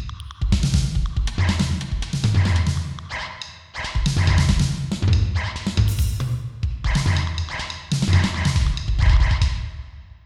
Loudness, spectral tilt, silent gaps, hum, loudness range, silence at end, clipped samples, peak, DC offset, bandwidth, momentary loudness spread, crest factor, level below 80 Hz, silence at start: -22 LUFS; -5 dB/octave; none; none; 2 LU; 0.25 s; under 0.1%; -4 dBFS; under 0.1%; 15 kHz; 11 LU; 16 dB; -24 dBFS; 0 s